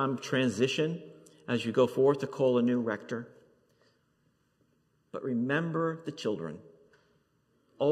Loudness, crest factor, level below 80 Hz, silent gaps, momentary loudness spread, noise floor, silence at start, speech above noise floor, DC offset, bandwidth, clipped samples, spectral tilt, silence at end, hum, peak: -30 LUFS; 18 dB; -80 dBFS; none; 16 LU; -72 dBFS; 0 s; 43 dB; under 0.1%; 13.5 kHz; under 0.1%; -6 dB/octave; 0 s; none; -14 dBFS